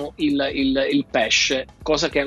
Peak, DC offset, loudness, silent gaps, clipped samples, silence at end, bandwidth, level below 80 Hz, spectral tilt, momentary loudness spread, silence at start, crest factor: -6 dBFS; under 0.1%; -20 LUFS; none; under 0.1%; 0 s; 11 kHz; -44 dBFS; -3 dB/octave; 6 LU; 0 s; 14 dB